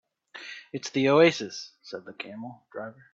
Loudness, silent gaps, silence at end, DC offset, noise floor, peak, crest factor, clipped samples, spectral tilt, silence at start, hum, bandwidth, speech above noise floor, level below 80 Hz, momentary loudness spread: -24 LUFS; none; 0.2 s; under 0.1%; -45 dBFS; -8 dBFS; 20 dB; under 0.1%; -5 dB/octave; 0.35 s; none; 7.8 kHz; 18 dB; -70 dBFS; 21 LU